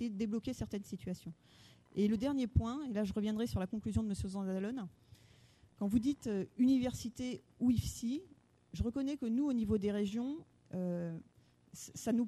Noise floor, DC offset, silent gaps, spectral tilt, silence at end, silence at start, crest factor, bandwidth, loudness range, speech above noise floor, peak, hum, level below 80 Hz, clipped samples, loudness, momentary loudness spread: -64 dBFS; under 0.1%; none; -7 dB/octave; 0 s; 0 s; 20 dB; 13.5 kHz; 2 LU; 28 dB; -18 dBFS; none; -54 dBFS; under 0.1%; -37 LUFS; 11 LU